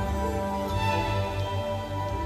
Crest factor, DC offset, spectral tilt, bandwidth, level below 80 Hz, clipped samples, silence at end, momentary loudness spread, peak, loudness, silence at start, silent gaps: 14 dB; under 0.1%; -6 dB/octave; 15 kHz; -38 dBFS; under 0.1%; 0 s; 5 LU; -14 dBFS; -29 LUFS; 0 s; none